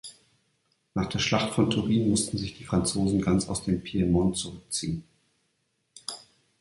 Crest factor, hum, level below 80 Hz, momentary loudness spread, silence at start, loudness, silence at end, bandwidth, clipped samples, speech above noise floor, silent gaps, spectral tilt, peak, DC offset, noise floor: 20 dB; none; -48 dBFS; 14 LU; 0.05 s; -27 LUFS; 0.45 s; 11.5 kHz; under 0.1%; 49 dB; none; -5 dB/octave; -8 dBFS; under 0.1%; -75 dBFS